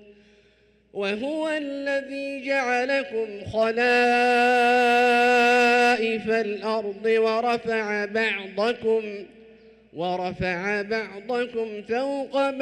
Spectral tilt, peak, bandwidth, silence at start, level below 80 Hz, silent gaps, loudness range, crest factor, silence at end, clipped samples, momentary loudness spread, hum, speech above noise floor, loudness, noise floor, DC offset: -4 dB/octave; -12 dBFS; 13.5 kHz; 0.95 s; -60 dBFS; none; 8 LU; 12 dB; 0 s; under 0.1%; 11 LU; none; 37 dB; -23 LUFS; -60 dBFS; under 0.1%